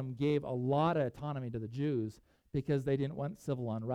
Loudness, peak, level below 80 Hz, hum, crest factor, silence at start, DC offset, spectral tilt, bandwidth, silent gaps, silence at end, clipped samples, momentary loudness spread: -35 LUFS; -20 dBFS; -62 dBFS; none; 16 dB; 0 s; under 0.1%; -8.5 dB/octave; 10.5 kHz; none; 0 s; under 0.1%; 9 LU